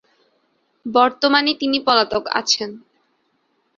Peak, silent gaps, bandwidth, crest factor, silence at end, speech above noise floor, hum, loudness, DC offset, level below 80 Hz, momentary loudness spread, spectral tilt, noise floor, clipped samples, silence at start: 0 dBFS; none; 7.8 kHz; 20 dB; 1 s; 48 dB; none; -17 LUFS; under 0.1%; -60 dBFS; 5 LU; -2 dB/octave; -66 dBFS; under 0.1%; 0.85 s